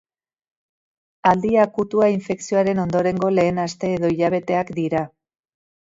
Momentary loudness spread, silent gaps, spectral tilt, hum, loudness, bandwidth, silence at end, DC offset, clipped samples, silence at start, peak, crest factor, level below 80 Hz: 6 LU; none; -6.5 dB/octave; none; -20 LUFS; 7.8 kHz; 0.8 s; under 0.1%; under 0.1%; 1.25 s; -2 dBFS; 18 dB; -54 dBFS